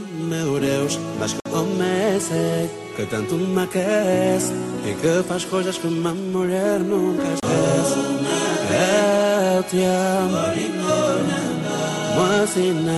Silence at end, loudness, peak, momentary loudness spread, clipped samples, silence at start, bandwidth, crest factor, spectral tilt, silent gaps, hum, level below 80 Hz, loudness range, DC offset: 0 s; -21 LUFS; -8 dBFS; 6 LU; under 0.1%; 0 s; 12.5 kHz; 12 dB; -5 dB/octave; none; none; -56 dBFS; 3 LU; under 0.1%